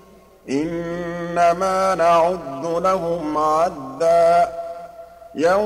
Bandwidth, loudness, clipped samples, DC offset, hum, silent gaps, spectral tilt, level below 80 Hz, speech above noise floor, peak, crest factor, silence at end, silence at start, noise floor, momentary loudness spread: 14 kHz; -19 LUFS; under 0.1%; under 0.1%; none; none; -5.5 dB/octave; -50 dBFS; 22 dB; -6 dBFS; 12 dB; 0 s; 0.45 s; -40 dBFS; 12 LU